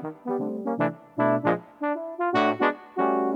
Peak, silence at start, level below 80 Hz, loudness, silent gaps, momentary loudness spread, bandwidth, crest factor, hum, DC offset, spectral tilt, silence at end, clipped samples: -6 dBFS; 0 s; -78 dBFS; -26 LUFS; none; 7 LU; 7.4 kHz; 20 dB; none; under 0.1%; -7.5 dB/octave; 0 s; under 0.1%